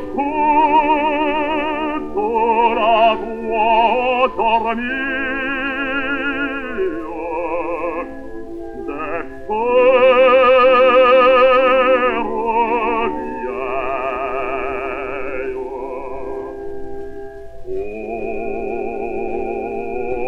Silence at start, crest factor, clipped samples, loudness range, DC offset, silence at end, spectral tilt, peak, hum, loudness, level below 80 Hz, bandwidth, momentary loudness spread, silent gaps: 0 s; 16 dB; under 0.1%; 14 LU; under 0.1%; 0 s; -6 dB/octave; -2 dBFS; none; -17 LUFS; -42 dBFS; 5.2 kHz; 17 LU; none